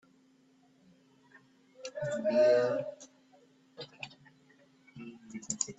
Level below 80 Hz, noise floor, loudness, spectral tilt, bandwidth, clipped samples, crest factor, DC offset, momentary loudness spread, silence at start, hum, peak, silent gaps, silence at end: -78 dBFS; -66 dBFS; -31 LUFS; -3.5 dB/octave; 8.2 kHz; under 0.1%; 22 dB; under 0.1%; 24 LU; 1.8 s; none; -14 dBFS; none; 0.05 s